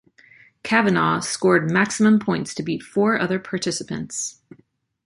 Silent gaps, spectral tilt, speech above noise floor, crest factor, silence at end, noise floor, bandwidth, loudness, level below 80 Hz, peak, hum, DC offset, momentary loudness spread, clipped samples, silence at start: none; -4.5 dB/octave; 31 dB; 20 dB; 0.75 s; -52 dBFS; 11.5 kHz; -21 LUFS; -60 dBFS; -2 dBFS; none; under 0.1%; 10 LU; under 0.1%; 0.65 s